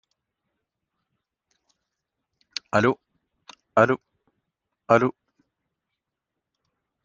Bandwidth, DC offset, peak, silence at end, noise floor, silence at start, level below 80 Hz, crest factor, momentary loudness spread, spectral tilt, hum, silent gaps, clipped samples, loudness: 7.6 kHz; under 0.1%; -2 dBFS; 1.95 s; -84 dBFS; 2.75 s; -66 dBFS; 26 dB; 14 LU; -6 dB/octave; none; none; under 0.1%; -23 LUFS